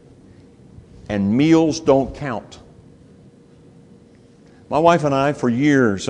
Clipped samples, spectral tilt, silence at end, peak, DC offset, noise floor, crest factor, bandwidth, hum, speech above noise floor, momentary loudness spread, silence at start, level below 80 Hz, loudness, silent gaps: under 0.1%; -6.5 dB/octave; 0 s; 0 dBFS; under 0.1%; -48 dBFS; 20 dB; 10 kHz; none; 31 dB; 12 LU; 1.1 s; -48 dBFS; -17 LUFS; none